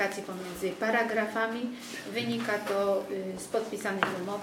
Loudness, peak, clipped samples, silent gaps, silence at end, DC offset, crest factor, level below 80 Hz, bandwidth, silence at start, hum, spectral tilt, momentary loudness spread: -31 LUFS; -6 dBFS; under 0.1%; none; 0 s; under 0.1%; 24 dB; -68 dBFS; 17 kHz; 0 s; none; -4 dB/octave; 8 LU